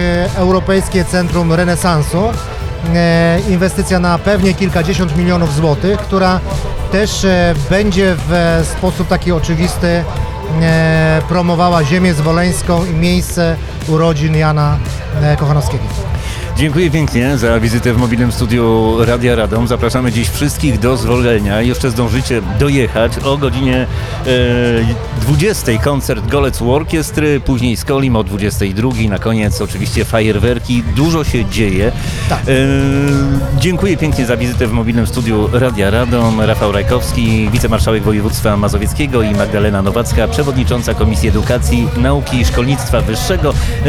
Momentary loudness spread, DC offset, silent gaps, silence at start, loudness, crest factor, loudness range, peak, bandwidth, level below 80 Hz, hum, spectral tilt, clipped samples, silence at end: 4 LU; under 0.1%; none; 0 s; -13 LUFS; 12 dB; 2 LU; 0 dBFS; 16.5 kHz; -22 dBFS; none; -6 dB/octave; under 0.1%; 0 s